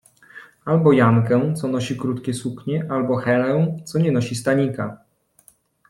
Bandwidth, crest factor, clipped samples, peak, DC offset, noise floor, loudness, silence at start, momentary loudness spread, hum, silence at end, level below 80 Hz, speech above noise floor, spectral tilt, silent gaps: 12.5 kHz; 18 dB; under 0.1%; -4 dBFS; under 0.1%; -56 dBFS; -20 LUFS; 0.35 s; 11 LU; none; 0.95 s; -58 dBFS; 37 dB; -7 dB/octave; none